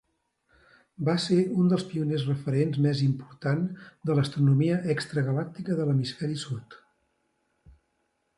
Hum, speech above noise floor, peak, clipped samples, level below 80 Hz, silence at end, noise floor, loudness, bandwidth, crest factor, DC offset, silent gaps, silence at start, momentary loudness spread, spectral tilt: none; 49 dB; -12 dBFS; under 0.1%; -66 dBFS; 1.6 s; -75 dBFS; -27 LUFS; 11.5 kHz; 16 dB; under 0.1%; none; 1 s; 9 LU; -7.5 dB/octave